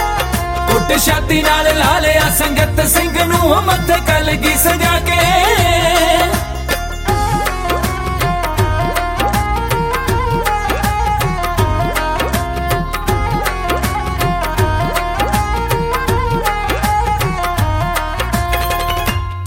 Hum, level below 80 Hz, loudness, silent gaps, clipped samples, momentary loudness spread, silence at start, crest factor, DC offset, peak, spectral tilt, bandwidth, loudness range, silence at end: none; -22 dBFS; -15 LUFS; none; under 0.1%; 6 LU; 0 s; 14 dB; under 0.1%; 0 dBFS; -4 dB/octave; 17 kHz; 5 LU; 0 s